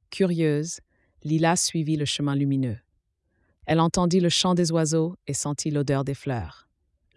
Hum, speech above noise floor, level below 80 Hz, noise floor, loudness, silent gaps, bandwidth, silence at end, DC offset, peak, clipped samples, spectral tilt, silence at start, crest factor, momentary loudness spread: none; 49 dB; -54 dBFS; -73 dBFS; -24 LUFS; none; 12 kHz; 0.6 s; under 0.1%; -8 dBFS; under 0.1%; -5 dB/octave; 0.1 s; 16 dB; 12 LU